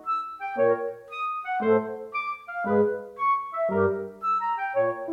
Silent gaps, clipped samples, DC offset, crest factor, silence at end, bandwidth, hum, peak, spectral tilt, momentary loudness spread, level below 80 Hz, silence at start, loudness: none; under 0.1%; under 0.1%; 16 dB; 0 s; 7 kHz; none; -10 dBFS; -8 dB/octave; 8 LU; -72 dBFS; 0 s; -27 LUFS